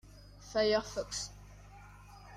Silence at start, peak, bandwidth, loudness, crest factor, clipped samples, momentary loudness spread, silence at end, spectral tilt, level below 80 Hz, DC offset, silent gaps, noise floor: 0.05 s; -18 dBFS; 14.5 kHz; -34 LUFS; 20 dB; under 0.1%; 25 LU; 0 s; -3 dB/octave; -56 dBFS; under 0.1%; none; -54 dBFS